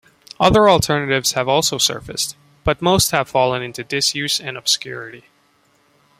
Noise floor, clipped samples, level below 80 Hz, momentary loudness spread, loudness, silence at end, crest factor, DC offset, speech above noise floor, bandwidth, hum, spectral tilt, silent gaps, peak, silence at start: -58 dBFS; under 0.1%; -42 dBFS; 11 LU; -17 LUFS; 1 s; 18 dB; under 0.1%; 41 dB; 16 kHz; none; -3 dB/octave; none; 0 dBFS; 0.4 s